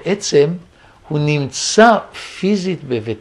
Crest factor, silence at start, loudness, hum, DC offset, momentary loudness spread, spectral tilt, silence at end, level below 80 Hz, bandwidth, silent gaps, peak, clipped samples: 16 dB; 0.05 s; -16 LUFS; none; under 0.1%; 12 LU; -4.5 dB/octave; 0 s; -54 dBFS; 11.5 kHz; none; 0 dBFS; under 0.1%